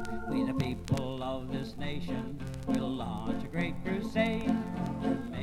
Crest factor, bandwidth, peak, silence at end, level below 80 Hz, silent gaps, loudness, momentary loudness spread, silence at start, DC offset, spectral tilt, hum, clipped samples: 16 dB; 15 kHz; -16 dBFS; 0 s; -48 dBFS; none; -34 LUFS; 7 LU; 0 s; under 0.1%; -7 dB/octave; none; under 0.1%